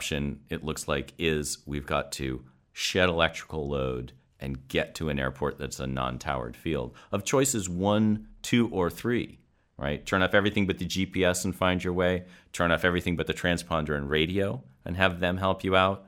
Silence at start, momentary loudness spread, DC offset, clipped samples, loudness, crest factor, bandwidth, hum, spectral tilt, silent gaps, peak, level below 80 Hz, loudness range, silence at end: 0 s; 10 LU; under 0.1%; under 0.1%; -28 LUFS; 24 dB; 16.5 kHz; none; -4.5 dB/octave; none; -4 dBFS; -46 dBFS; 4 LU; 0.05 s